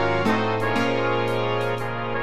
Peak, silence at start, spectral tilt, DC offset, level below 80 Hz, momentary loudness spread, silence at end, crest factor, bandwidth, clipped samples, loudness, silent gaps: -10 dBFS; 0 s; -6 dB/octave; 2%; -56 dBFS; 5 LU; 0 s; 12 dB; 14 kHz; under 0.1%; -23 LUFS; none